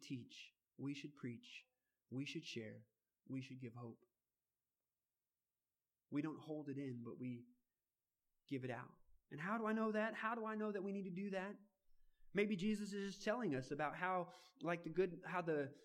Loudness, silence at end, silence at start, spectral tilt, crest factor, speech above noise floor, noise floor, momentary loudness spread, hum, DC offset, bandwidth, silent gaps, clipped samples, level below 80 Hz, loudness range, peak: -46 LUFS; 0 s; 0 s; -6 dB/octave; 22 dB; over 45 dB; under -90 dBFS; 15 LU; none; under 0.1%; 12.5 kHz; none; under 0.1%; -78 dBFS; 10 LU; -26 dBFS